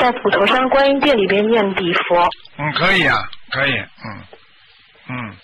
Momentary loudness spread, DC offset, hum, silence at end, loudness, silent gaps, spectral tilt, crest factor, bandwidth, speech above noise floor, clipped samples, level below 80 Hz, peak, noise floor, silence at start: 16 LU; under 0.1%; none; 0.1 s; -15 LUFS; none; -6 dB/octave; 12 dB; 11.5 kHz; 33 dB; under 0.1%; -46 dBFS; -6 dBFS; -50 dBFS; 0 s